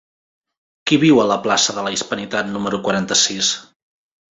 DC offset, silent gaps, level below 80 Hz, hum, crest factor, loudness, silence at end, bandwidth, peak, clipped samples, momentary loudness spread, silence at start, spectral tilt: under 0.1%; none; -58 dBFS; none; 18 dB; -17 LUFS; 0.7 s; 8.2 kHz; -2 dBFS; under 0.1%; 9 LU; 0.85 s; -3 dB/octave